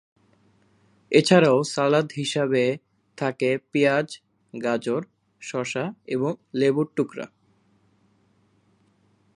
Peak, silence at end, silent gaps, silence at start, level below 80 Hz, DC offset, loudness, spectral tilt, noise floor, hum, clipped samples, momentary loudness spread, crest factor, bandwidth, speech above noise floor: -2 dBFS; 2.1 s; none; 1.1 s; -72 dBFS; under 0.1%; -23 LUFS; -5.5 dB/octave; -64 dBFS; none; under 0.1%; 17 LU; 24 dB; 11.5 kHz; 41 dB